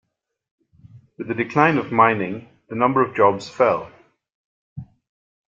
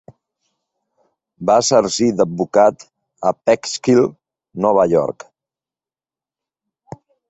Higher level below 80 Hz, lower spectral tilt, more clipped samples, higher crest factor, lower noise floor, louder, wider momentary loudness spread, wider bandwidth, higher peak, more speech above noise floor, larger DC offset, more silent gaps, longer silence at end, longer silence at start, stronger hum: about the same, -62 dBFS vs -58 dBFS; first, -7 dB/octave vs -4.5 dB/octave; neither; about the same, 20 dB vs 18 dB; second, -48 dBFS vs under -90 dBFS; second, -19 LUFS vs -16 LUFS; first, 23 LU vs 9 LU; about the same, 7.6 kHz vs 8.2 kHz; about the same, -2 dBFS vs -2 dBFS; second, 29 dB vs over 75 dB; neither; first, 4.34-4.76 s vs none; second, 0.7 s vs 2.2 s; second, 0.95 s vs 1.4 s; neither